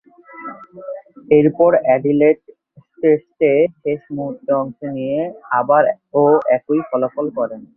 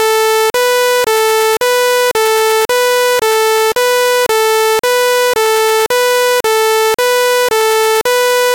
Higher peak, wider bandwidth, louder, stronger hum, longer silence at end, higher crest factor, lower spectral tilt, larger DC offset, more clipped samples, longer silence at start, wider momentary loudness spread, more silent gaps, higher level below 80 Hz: about the same, 0 dBFS vs -2 dBFS; second, 3.3 kHz vs 17.5 kHz; second, -17 LUFS vs -11 LUFS; neither; about the same, 0.1 s vs 0 s; first, 16 dB vs 8 dB; first, -11 dB/octave vs 0.5 dB/octave; neither; neither; first, 0.35 s vs 0 s; first, 18 LU vs 1 LU; neither; second, -60 dBFS vs -54 dBFS